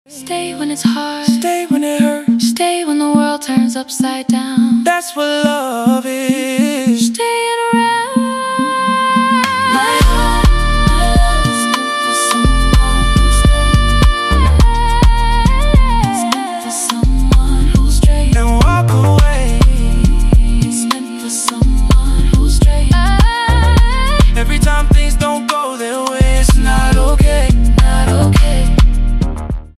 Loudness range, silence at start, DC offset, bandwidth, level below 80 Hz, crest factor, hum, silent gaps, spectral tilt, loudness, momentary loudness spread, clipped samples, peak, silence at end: 2 LU; 0.1 s; under 0.1%; 14 kHz; -12 dBFS; 10 dB; none; none; -5 dB/octave; -13 LUFS; 5 LU; under 0.1%; 0 dBFS; 0.1 s